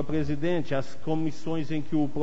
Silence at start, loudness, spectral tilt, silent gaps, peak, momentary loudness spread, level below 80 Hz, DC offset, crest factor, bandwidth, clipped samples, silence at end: 0 s; -30 LUFS; -7.5 dB/octave; none; -14 dBFS; 4 LU; -50 dBFS; 5%; 12 dB; 8 kHz; under 0.1%; 0 s